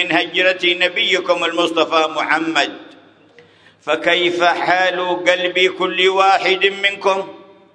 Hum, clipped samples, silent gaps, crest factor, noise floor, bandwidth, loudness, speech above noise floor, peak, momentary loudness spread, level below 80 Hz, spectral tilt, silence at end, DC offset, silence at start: none; under 0.1%; none; 18 dB; -48 dBFS; 10.5 kHz; -15 LUFS; 32 dB; 0 dBFS; 5 LU; -68 dBFS; -3 dB/octave; 0.3 s; under 0.1%; 0 s